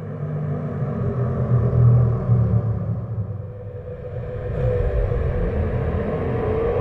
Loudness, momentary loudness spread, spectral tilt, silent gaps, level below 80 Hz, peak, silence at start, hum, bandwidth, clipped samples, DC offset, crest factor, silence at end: -22 LUFS; 14 LU; -11.5 dB/octave; none; -30 dBFS; -6 dBFS; 0 s; none; 3.4 kHz; under 0.1%; under 0.1%; 16 dB; 0 s